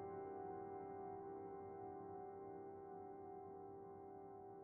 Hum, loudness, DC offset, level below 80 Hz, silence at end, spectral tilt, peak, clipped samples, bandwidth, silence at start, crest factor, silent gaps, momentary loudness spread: none; -54 LUFS; under 0.1%; -84 dBFS; 0 s; -4 dB/octave; -40 dBFS; under 0.1%; 2.5 kHz; 0 s; 12 dB; none; 6 LU